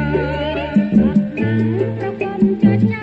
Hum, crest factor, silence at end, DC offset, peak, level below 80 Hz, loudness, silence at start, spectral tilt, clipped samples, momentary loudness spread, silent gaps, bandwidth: none; 14 dB; 0 s; under 0.1%; -2 dBFS; -36 dBFS; -17 LUFS; 0 s; -9.5 dB/octave; under 0.1%; 7 LU; none; 5 kHz